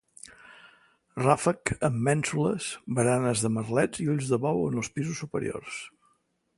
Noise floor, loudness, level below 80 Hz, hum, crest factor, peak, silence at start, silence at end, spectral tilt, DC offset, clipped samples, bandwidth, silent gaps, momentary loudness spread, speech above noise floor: -71 dBFS; -27 LUFS; -58 dBFS; none; 22 dB; -6 dBFS; 0.3 s; 0.7 s; -5.5 dB/octave; under 0.1%; under 0.1%; 11.5 kHz; none; 15 LU; 44 dB